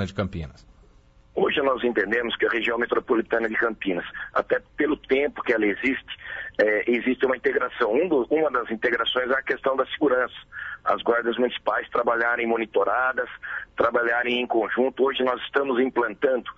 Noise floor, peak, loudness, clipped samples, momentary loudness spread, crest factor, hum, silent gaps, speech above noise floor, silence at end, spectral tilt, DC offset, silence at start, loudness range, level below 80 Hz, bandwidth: -54 dBFS; -8 dBFS; -24 LUFS; under 0.1%; 8 LU; 16 dB; none; none; 31 dB; 0.05 s; -6.5 dB/octave; under 0.1%; 0 s; 1 LU; -54 dBFS; 7.8 kHz